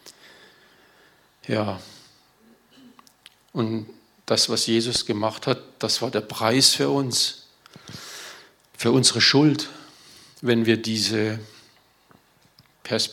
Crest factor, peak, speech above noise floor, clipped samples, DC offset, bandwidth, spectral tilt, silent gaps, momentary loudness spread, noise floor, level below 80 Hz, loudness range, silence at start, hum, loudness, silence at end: 24 dB; 0 dBFS; 36 dB; under 0.1%; under 0.1%; 17.5 kHz; -3.5 dB/octave; none; 22 LU; -58 dBFS; -66 dBFS; 11 LU; 0.05 s; none; -21 LUFS; 0 s